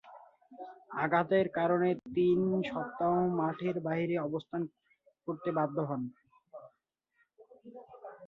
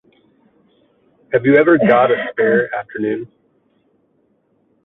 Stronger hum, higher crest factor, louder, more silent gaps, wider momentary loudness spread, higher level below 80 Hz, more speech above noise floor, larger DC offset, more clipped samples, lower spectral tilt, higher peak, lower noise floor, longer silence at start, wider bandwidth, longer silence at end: neither; about the same, 20 dB vs 16 dB; second, -32 LUFS vs -15 LUFS; neither; first, 22 LU vs 12 LU; second, -72 dBFS vs -62 dBFS; about the same, 48 dB vs 47 dB; neither; neither; about the same, -9.5 dB/octave vs -9.5 dB/octave; second, -14 dBFS vs -2 dBFS; first, -79 dBFS vs -61 dBFS; second, 0.05 s vs 1.3 s; first, 4.5 kHz vs 4 kHz; second, 0 s vs 1.6 s